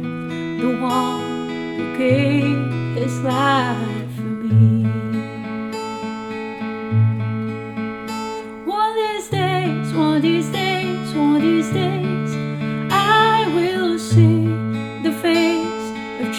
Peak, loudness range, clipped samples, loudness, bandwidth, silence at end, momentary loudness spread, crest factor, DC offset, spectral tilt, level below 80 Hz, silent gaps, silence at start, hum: -2 dBFS; 6 LU; under 0.1%; -20 LUFS; 14.5 kHz; 0 s; 12 LU; 16 dB; under 0.1%; -6.5 dB/octave; -56 dBFS; none; 0 s; none